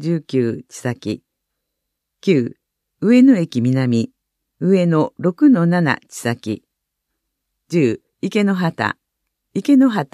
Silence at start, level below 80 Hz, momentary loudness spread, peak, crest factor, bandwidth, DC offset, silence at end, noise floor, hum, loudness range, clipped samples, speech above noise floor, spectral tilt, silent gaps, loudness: 0 s; -66 dBFS; 14 LU; -2 dBFS; 16 dB; 13 kHz; under 0.1%; 0.1 s; -77 dBFS; none; 6 LU; under 0.1%; 61 dB; -7 dB/octave; none; -17 LUFS